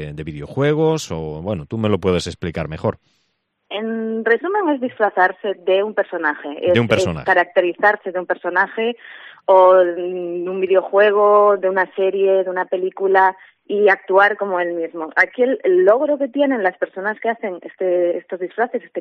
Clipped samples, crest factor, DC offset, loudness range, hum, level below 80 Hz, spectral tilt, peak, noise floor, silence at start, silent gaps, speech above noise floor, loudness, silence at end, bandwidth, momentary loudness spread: under 0.1%; 16 dB; under 0.1%; 6 LU; none; -52 dBFS; -6 dB/octave; -2 dBFS; -69 dBFS; 0 s; none; 52 dB; -18 LUFS; 0 s; 10 kHz; 12 LU